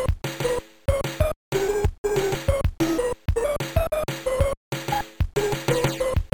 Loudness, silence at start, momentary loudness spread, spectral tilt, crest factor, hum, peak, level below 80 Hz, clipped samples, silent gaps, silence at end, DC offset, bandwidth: -25 LUFS; 0 s; 4 LU; -5.5 dB/octave; 16 dB; none; -8 dBFS; -32 dBFS; under 0.1%; 1.36-1.52 s, 1.98-2.04 s, 4.57-4.71 s; 0.05 s; 0.3%; 18 kHz